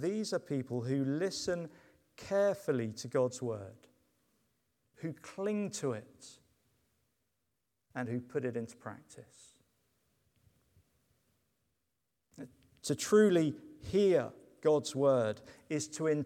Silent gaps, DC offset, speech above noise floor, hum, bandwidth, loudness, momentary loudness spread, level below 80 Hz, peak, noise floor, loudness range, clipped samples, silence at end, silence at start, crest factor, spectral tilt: none; under 0.1%; 52 dB; none; 15.5 kHz; -34 LUFS; 20 LU; -72 dBFS; -14 dBFS; -85 dBFS; 13 LU; under 0.1%; 0 s; 0 s; 22 dB; -5.5 dB/octave